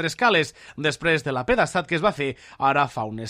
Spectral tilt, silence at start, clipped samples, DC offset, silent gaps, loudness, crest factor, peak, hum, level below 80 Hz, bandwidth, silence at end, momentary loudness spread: -4.5 dB/octave; 0 s; under 0.1%; under 0.1%; none; -23 LUFS; 16 dB; -6 dBFS; none; -50 dBFS; 14.5 kHz; 0 s; 8 LU